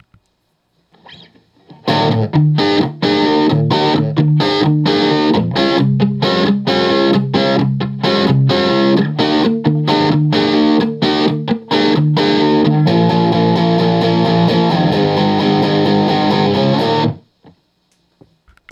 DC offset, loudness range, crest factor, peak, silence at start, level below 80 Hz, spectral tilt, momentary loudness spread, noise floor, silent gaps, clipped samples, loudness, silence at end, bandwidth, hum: under 0.1%; 2 LU; 14 dB; 0 dBFS; 1.1 s; -54 dBFS; -7.5 dB/octave; 3 LU; -64 dBFS; none; under 0.1%; -13 LUFS; 1.55 s; 7.8 kHz; none